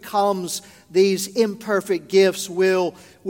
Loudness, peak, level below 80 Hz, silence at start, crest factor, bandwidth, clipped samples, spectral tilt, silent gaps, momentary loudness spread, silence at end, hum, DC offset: -21 LUFS; -4 dBFS; -68 dBFS; 0.05 s; 16 dB; 17 kHz; under 0.1%; -4.5 dB/octave; none; 9 LU; 0 s; none; under 0.1%